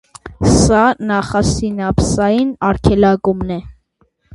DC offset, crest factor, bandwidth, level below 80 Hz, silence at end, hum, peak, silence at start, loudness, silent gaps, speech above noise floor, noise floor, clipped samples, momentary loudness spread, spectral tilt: under 0.1%; 14 dB; 11.5 kHz; -28 dBFS; 0.6 s; none; 0 dBFS; 0.25 s; -14 LUFS; none; 45 dB; -60 dBFS; under 0.1%; 7 LU; -5.5 dB/octave